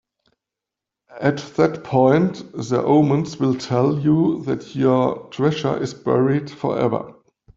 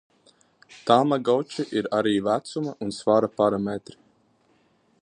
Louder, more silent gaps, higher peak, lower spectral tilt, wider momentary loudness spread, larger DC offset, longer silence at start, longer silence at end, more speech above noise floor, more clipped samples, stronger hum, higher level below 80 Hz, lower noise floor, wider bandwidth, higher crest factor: first, -20 LUFS vs -24 LUFS; neither; about the same, -2 dBFS vs -2 dBFS; first, -7.5 dB/octave vs -6 dB/octave; second, 8 LU vs 11 LU; neither; first, 1.1 s vs 0.7 s; second, 0.45 s vs 1.25 s; first, 67 dB vs 41 dB; neither; neither; first, -58 dBFS vs -64 dBFS; first, -86 dBFS vs -64 dBFS; second, 7.8 kHz vs 10.5 kHz; about the same, 18 dB vs 22 dB